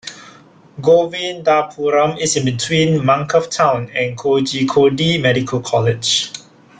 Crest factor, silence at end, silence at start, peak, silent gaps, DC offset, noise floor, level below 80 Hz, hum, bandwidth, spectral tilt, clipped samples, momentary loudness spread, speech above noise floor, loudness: 14 dB; 0.4 s; 0.05 s; -2 dBFS; none; under 0.1%; -44 dBFS; -52 dBFS; none; 9.6 kHz; -4.5 dB/octave; under 0.1%; 6 LU; 28 dB; -16 LUFS